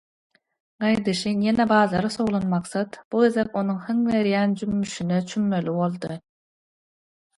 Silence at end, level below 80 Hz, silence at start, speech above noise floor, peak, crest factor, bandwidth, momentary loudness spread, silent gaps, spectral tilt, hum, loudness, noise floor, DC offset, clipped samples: 1.2 s; -58 dBFS; 0.8 s; over 67 dB; -6 dBFS; 18 dB; 11.5 kHz; 8 LU; 3.05-3.11 s; -6 dB/octave; none; -23 LUFS; under -90 dBFS; under 0.1%; under 0.1%